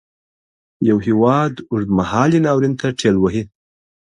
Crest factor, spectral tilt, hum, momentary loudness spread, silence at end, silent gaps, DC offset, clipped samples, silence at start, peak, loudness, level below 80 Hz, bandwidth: 18 dB; -7 dB/octave; none; 6 LU; 0.65 s; none; under 0.1%; under 0.1%; 0.8 s; 0 dBFS; -17 LUFS; -46 dBFS; 11 kHz